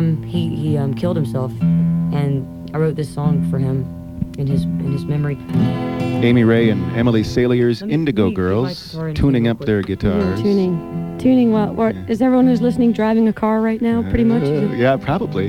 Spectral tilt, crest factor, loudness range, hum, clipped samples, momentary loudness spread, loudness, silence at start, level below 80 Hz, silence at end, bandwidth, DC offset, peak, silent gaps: -8.5 dB/octave; 12 dB; 4 LU; none; under 0.1%; 7 LU; -18 LUFS; 0 s; -38 dBFS; 0 s; 13 kHz; 0.1%; -4 dBFS; none